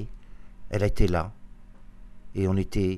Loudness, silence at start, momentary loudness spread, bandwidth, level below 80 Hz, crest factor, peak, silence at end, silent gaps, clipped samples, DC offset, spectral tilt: -28 LUFS; 0 s; 13 LU; 13 kHz; -36 dBFS; 20 dB; -8 dBFS; 0 s; none; under 0.1%; under 0.1%; -7.5 dB/octave